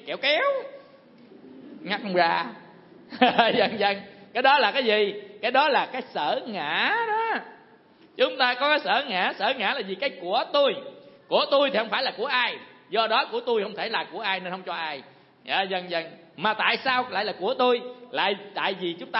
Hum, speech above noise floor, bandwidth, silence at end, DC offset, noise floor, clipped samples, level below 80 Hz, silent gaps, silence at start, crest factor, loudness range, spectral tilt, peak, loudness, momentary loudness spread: none; 30 dB; 5.8 kHz; 0 s; under 0.1%; -55 dBFS; under 0.1%; -78 dBFS; none; 0.05 s; 24 dB; 4 LU; -7.5 dB/octave; -2 dBFS; -24 LUFS; 11 LU